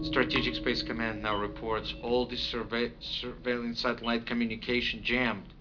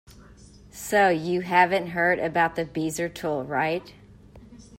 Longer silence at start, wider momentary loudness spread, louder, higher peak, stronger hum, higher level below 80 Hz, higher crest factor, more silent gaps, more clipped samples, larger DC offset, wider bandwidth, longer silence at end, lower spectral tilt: second, 0 s vs 0.15 s; second, 5 LU vs 9 LU; second, -31 LUFS vs -24 LUFS; second, -12 dBFS vs -6 dBFS; second, none vs 50 Hz at -60 dBFS; first, -48 dBFS vs -56 dBFS; about the same, 20 dB vs 20 dB; neither; neither; neither; second, 5.4 kHz vs 16 kHz; about the same, 0 s vs 0.05 s; about the same, -5.5 dB/octave vs -5 dB/octave